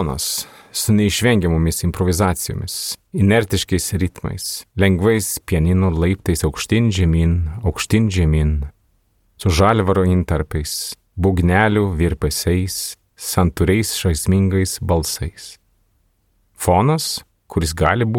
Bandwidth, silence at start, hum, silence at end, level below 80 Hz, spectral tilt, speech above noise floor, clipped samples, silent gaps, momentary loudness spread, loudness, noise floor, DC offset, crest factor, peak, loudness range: 17.5 kHz; 0 s; none; 0 s; -30 dBFS; -5 dB/octave; 45 dB; under 0.1%; none; 10 LU; -18 LUFS; -62 dBFS; under 0.1%; 18 dB; 0 dBFS; 2 LU